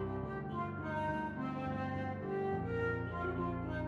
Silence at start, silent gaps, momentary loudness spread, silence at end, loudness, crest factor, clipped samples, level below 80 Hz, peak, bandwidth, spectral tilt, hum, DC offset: 0 s; none; 3 LU; 0 s; -39 LUFS; 12 dB; under 0.1%; -56 dBFS; -26 dBFS; 11 kHz; -9 dB/octave; none; under 0.1%